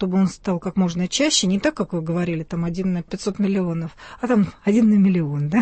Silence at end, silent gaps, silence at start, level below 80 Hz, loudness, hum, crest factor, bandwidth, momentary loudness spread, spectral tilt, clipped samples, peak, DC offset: 0 s; none; 0 s; -48 dBFS; -21 LUFS; none; 14 dB; 8.8 kHz; 9 LU; -5.5 dB/octave; under 0.1%; -6 dBFS; under 0.1%